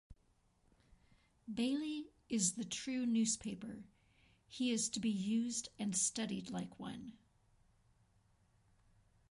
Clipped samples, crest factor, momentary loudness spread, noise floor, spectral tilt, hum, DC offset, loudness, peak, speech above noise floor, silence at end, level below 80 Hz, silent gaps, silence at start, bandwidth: under 0.1%; 20 dB; 14 LU; -75 dBFS; -3 dB/octave; none; under 0.1%; -39 LUFS; -22 dBFS; 36 dB; 2.2 s; -72 dBFS; none; 0.1 s; 11.5 kHz